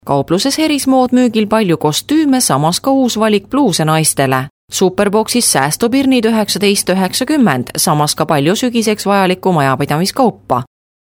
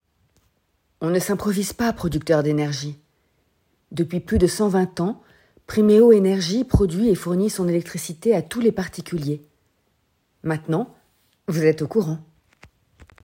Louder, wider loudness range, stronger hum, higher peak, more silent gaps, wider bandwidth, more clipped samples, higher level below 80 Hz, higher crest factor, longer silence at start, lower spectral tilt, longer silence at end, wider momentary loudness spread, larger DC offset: first, -13 LUFS vs -21 LUFS; second, 1 LU vs 7 LU; neither; first, 0 dBFS vs -4 dBFS; first, 4.50-4.68 s vs none; first, 19.5 kHz vs 16.5 kHz; neither; second, -50 dBFS vs -42 dBFS; second, 12 dB vs 18 dB; second, 0.05 s vs 1 s; second, -4 dB/octave vs -6.5 dB/octave; second, 0.35 s vs 1 s; second, 3 LU vs 13 LU; neither